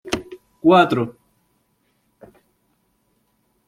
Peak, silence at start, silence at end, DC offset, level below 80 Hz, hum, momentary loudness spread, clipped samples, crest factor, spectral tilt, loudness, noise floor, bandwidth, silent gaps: -2 dBFS; 0.05 s; 2.55 s; under 0.1%; -58 dBFS; none; 15 LU; under 0.1%; 20 dB; -6 dB/octave; -18 LUFS; -66 dBFS; 15 kHz; none